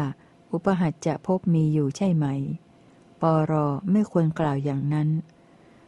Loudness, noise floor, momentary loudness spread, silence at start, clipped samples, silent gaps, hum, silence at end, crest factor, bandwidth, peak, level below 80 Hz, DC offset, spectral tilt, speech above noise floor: -25 LUFS; -54 dBFS; 9 LU; 0 s; under 0.1%; none; none; 0.65 s; 16 dB; 9 kHz; -8 dBFS; -60 dBFS; under 0.1%; -8.5 dB/octave; 30 dB